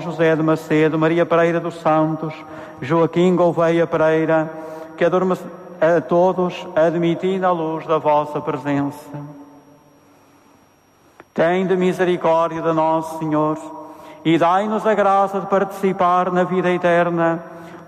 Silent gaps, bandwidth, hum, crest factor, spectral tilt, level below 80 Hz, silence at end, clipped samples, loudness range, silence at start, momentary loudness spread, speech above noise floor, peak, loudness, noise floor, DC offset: none; 14 kHz; none; 12 dB; -7.5 dB/octave; -64 dBFS; 0.05 s; under 0.1%; 6 LU; 0 s; 13 LU; 36 dB; -6 dBFS; -18 LUFS; -54 dBFS; under 0.1%